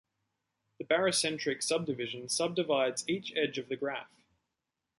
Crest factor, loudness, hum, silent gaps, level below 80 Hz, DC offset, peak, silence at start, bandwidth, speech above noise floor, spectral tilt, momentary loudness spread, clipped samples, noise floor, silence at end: 18 dB; -32 LUFS; none; none; -78 dBFS; under 0.1%; -16 dBFS; 0.8 s; 12 kHz; 55 dB; -3 dB/octave; 8 LU; under 0.1%; -87 dBFS; 0.95 s